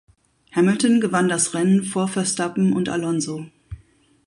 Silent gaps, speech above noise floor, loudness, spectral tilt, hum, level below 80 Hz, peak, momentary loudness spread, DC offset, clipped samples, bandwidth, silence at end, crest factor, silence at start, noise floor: none; 35 dB; -20 LUFS; -5 dB/octave; none; -54 dBFS; -6 dBFS; 9 LU; under 0.1%; under 0.1%; 11.5 kHz; 0.5 s; 14 dB; 0.55 s; -55 dBFS